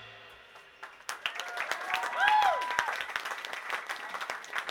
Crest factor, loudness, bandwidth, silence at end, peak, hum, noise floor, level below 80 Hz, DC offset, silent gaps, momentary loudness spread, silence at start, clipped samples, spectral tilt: 26 dB; -31 LUFS; 19 kHz; 0 s; -6 dBFS; none; -54 dBFS; -72 dBFS; under 0.1%; none; 23 LU; 0 s; under 0.1%; 0 dB/octave